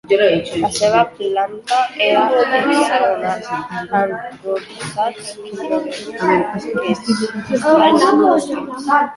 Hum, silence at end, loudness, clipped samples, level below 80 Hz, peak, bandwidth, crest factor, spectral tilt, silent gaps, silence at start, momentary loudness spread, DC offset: none; 0 s; -16 LUFS; under 0.1%; -56 dBFS; 0 dBFS; 11.5 kHz; 16 dB; -4.5 dB/octave; none; 0.05 s; 12 LU; under 0.1%